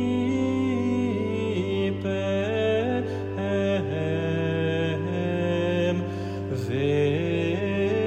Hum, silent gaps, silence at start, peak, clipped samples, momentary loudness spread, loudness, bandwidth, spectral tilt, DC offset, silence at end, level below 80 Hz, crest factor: none; none; 0 s; -12 dBFS; under 0.1%; 4 LU; -26 LUFS; 9.2 kHz; -7.5 dB/octave; under 0.1%; 0 s; -58 dBFS; 12 dB